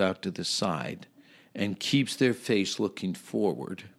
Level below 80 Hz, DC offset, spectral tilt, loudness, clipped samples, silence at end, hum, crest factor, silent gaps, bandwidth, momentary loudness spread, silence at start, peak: -72 dBFS; under 0.1%; -4.5 dB/octave; -29 LUFS; under 0.1%; 0.1 s; none; 20 dB; none; 15.5 kHz; 11 LU; 0 s; -10 dBFS